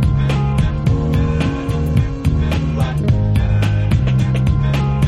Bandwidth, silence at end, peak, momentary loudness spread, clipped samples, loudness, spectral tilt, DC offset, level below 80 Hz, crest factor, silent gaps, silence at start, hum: 12.5 kHz; 0 s; -4 dBFS; 3 LU; under 0.1%; -17 LUFS; -8 dB/octave; under 0.1%; -22 dBFS; 12 dB; none; 0 s; none